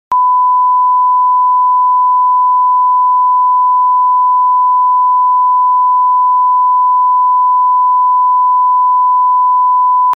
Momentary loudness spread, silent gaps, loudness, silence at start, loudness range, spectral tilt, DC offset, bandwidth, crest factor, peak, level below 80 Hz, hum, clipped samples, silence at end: 0 LU; none; -9 LUFS; 0.1 s; 0 LU; 5 dB/octave; under 0.1%; 1.4 kHz; 4 dB; -6 dBFS; -74 dBFS; none; under 0.1%; 0 s